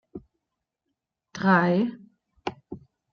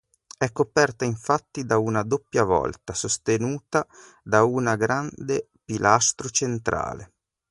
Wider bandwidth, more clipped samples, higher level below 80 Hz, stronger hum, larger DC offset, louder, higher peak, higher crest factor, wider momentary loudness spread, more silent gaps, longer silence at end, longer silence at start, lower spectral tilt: second, 6.8 kHz vs 11.5 kHz; neither; second, -66 dBFS vs -52 dBFS; neither; neither; about the same, -24 LUFS vs -24 LUFS; second, -6 dBFS vs -2 dBFS; about the same, 24 dB vs 22 dB; first, 24 LU vs 9 LU; neither; about the same, 0.35 s vs 0.45 s; second, 0.15 s vs 0.4 s; first, -7.5 dB/octave vs -4 dB/octave